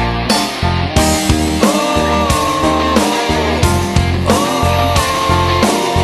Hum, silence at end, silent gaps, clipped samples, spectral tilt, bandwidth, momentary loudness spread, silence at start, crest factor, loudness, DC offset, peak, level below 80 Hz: none; 0 s; none; under 0.1%; -4.5 dB/octave; 13 kHz; 2 LU; 0 s; 12 dB; -13 LUFS; under 0.1%; 0 dBFS; -24 dBFS